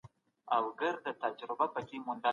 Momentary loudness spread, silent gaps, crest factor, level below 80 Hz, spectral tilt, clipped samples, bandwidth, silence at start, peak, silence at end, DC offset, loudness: 6 LU; none; 20 dB; -78 dBFS; -5.5 dB/octave; under 0.1%; 7.2 kHz; 0.05 s; -16 dBFS; 0 s; under 0.1%; -36 LUFS